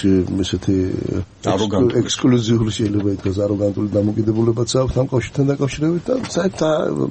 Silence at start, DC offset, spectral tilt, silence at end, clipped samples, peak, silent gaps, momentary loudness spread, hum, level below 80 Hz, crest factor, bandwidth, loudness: 0 s; under 0.1%; -6.5 dB/octave; 0 s; under 0.1%; -4 dBFS; none; 5 LU; none; -42 dBFS; 12 dB; 8.8 kHz; -19 LUFS